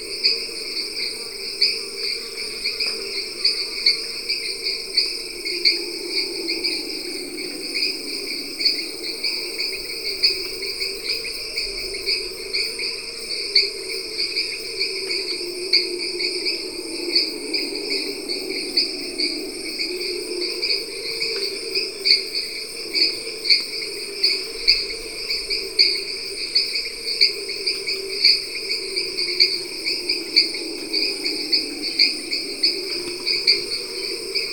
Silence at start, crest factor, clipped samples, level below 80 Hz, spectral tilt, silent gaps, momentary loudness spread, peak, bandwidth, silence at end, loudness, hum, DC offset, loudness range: 0 s; 24 dB; under 0.1%; -52 dBFS; 0 dB/octave; none; 9 LU; 0 dBFS; 19.5 kHz; 0 s; -21 LUFS; none; 0.4%; 4 LU